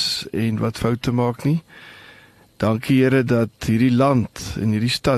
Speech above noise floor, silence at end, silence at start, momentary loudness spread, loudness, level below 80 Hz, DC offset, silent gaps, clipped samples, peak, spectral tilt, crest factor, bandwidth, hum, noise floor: 30 dB; 0 s; 0 s; 8 LU; -20 LUFS; -46 dBFS; under 0.1%; none; under 0.1%; -6 dBFS; -6 dB/octave; 14 dB; 13 kHz; none; -49 dBFS